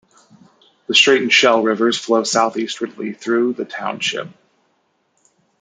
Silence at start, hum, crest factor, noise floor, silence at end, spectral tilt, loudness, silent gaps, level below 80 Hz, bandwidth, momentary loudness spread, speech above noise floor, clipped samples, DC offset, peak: 0.9 s; none; 18 dB; -65 dBFS; 1.3 s; -2.5 dB/octave; -16 LUFS; none; -72 dBFS; 9.6 kHz; 14 LU; 48 dB; under 0.1%; under 0.1%; 0 dBFS